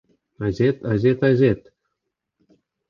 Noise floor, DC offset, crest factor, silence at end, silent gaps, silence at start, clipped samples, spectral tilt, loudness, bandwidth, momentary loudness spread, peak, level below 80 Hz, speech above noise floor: -80 dBFS; under 0.1%; 16 dB; 1.3 s; none; 0.4 s; under 0.1%; -9 dB/octave; -20 LUFS; 7 kHz; 11 LU; -6 dBFS; -50 dBFS; 61 dB